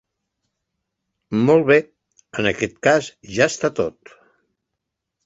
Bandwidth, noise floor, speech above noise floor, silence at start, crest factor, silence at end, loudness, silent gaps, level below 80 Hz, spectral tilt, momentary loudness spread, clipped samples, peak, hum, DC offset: 8 kHz; -81 dBFS; 62 dB; 1.3 s; 20 dB; 1.35 s; -19 LUFS; none; -56 dBFS; -5 dB/octave; 11 LU; under 0.1%; -2 dBFS; none; under 0.1%